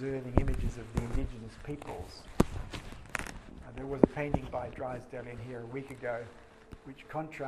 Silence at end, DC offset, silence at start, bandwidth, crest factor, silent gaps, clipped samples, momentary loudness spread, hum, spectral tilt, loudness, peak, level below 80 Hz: 0 s; under 0.1%; 0 s; 13.5 kHz; 32 dB; none; under 0.1%; 18 LU; none; -7 dB/octave; -36 LUFS; -4 dBFS; -42 dBFS